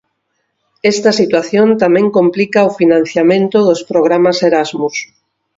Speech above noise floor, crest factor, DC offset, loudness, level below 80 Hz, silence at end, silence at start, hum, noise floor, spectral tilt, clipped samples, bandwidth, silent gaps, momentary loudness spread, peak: 56 dB; 12 dB; under 0.1%; -12 LUFS; -56 dBFS; 0.55 s; 0.85 s; none; -67 dBFS; -5.5 dB/octave; under 0.1%; 7.8 kHz; none; 6 LU; 0 dBFS